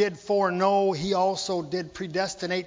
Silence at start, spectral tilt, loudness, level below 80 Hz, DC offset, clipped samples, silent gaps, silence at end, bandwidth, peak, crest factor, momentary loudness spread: 0 s; -4.5 dB/octave; -26 LUFS; -60 dBFS; under 0.1%; under 0.1%; none; 0 s; 7.6 kHz; -10 dBFS; 16 dB; 8 LU